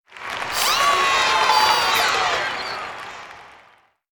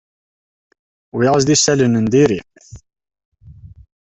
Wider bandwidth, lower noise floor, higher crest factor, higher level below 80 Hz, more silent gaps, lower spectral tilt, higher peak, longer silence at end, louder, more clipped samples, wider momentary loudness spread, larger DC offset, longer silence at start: first, 19 kHz vs 8.4 kHz; first, -55 dBFS vs -40 dBFS; about the same, 18 dB vs 16 dB; about the same, -54 dBFS vs -50 dBFS; second, none vs 3.25-3.32 s; second, 0 dB/octave vs -4.5 dB/octave; about the same, -4 dBFS vs -2 dBFS; first, 0.65 s vs 0.5 s; second, -18 LUFS vs -14 LUFS; neither; first, 16 LU vs 9 LU; neither; second, 0.1 s vs 1.15 s